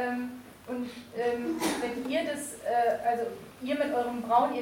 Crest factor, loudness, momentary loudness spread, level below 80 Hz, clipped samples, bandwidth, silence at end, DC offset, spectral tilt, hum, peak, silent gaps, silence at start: 18 dB; -31 LUFS; 11 LU; -66 dBFS; under 0.1%; 17 kHz; 0 s; under 0.1%; -4 dB/octave; none; -12 dBFS; none; 0 s